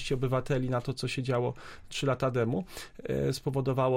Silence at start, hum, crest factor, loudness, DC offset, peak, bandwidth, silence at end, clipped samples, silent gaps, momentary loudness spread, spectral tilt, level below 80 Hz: 0 s; none; 14 dB; -31 LUFS; under 0.1%; -16 dBFS; 16 kHz; 0 s; under 0.1%; none; 8 LU; -6.5 dB/octave; -50 dBFS